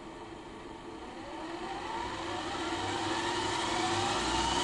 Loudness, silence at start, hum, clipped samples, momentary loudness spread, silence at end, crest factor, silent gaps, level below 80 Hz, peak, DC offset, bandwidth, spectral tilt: -34 LUFS; 0 s; none; under 0.1%; 15 LU; 0 s; 16 dB; none; -52 dBFS; -20 dBFS; under 0.1%; 11.5 kHz; -3 dB/octave